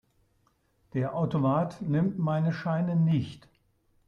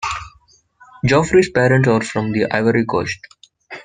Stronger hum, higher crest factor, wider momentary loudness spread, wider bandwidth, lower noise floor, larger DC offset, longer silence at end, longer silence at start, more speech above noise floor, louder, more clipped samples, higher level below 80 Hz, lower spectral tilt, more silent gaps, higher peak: neither; about the same, 14 dB vs 18 dB; second, 6 LU vs 13 LU; second, 6.6 kHz vs 9.6 kHz; first, -70 dBFS vs -54 dBFS; neither; first, 0.7 s vs 0.05 s; first, 0.95 s vs 0 s; first, 43 dB vs 38 dB; second, -28 LUFS vs -16 LUFS; neither; second, -64 dBFS vs -46 dBFS; first, -9.5 dB/octave vs -6 dB/octave; neither; second, -16 dBFS vs 0 dBFS